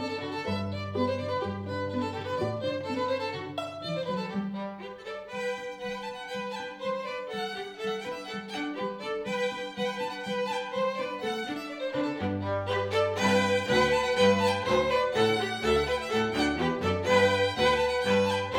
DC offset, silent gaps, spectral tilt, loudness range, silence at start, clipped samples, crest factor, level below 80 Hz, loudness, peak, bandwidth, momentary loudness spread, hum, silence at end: under 0.1%; none; -5 dB/octave; 9 LU; 0 s; under 0.1%; 18 dB; -54 dBFS; -29 LUFS; -10 dBFS; 16 kHz; 11 LU; none; 0 s